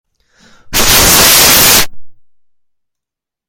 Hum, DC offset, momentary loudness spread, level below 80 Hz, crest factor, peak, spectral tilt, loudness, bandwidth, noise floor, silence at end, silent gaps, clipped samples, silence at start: none; under 0.1%; 11 LU; -28 dBFS; 10 dB; 0 dBFS; -0.5 dB/octave; -5 LUFS; over 20 kHz; -81 dBFS; 1.35 s; none; 1%; 0.65 s